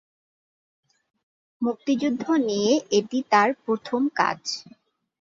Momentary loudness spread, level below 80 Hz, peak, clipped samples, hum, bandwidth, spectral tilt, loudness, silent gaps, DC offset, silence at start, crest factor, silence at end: 9 LU; -70 dBFS; -4 dBFS; under 0.1%; none; 7.8 kHz; -4 dB/octave; -24 LUFS; none; under 0.1%; 1.6 s; 20 dB; 0.6 s